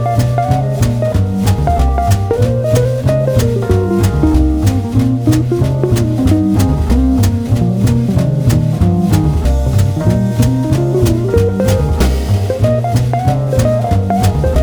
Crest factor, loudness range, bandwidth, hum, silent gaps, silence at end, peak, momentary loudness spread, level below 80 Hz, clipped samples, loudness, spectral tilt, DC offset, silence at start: 12 dB; 1 LU; over 20 kHz; none; none; 0 s; 0 dBFS; 2 LU; -20 dBFS; under 0.1%; -13 LUFS; -7.5 dB/octave; under 0.1%; 0 s